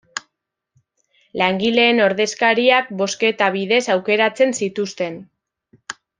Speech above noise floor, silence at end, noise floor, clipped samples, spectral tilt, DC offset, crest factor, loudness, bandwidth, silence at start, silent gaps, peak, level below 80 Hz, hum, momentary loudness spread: 59 dB; 0.3 s; -76 dBFS; under 0.1%; -3.5 dB/octave; under 0.1%; 18 dB; -17 LUFS; 10 kHz; 0.15 s; none; -2 dBFS; -66 dBFS; none; 17 LU